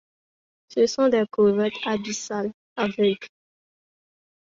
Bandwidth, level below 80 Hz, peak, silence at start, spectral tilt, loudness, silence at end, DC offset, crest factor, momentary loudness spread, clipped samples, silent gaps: 7.8 kHz; -66 dBFS; -8 dBFS; 0.7 s; -4.5 dB/octave; -24 LUFS; 1.15 s; under 0.1%; 16 dB; 11 LU; under 0.1%; 2.54-2.76 s